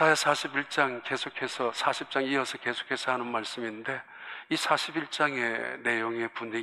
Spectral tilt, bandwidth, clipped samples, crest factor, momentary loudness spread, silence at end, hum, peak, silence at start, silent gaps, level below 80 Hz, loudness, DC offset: -3 dB/octave; 14.5 kHz; under 0.1%; 22 dB; 8 LU; 0 s; none; -8 dBFS; 0 s; none; -82 dBFS; -29 LUFS; under 0.1%